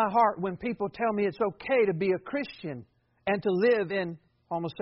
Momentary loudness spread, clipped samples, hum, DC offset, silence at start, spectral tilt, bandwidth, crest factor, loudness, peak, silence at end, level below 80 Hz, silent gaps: 12 LU; under 0.1%; none; under 0.1%; 0 s; -5 dB/octave; 5.8 kHz; 16 dB; -28 LUFS; -12 dBFS; 0 s; -66 dBFS; none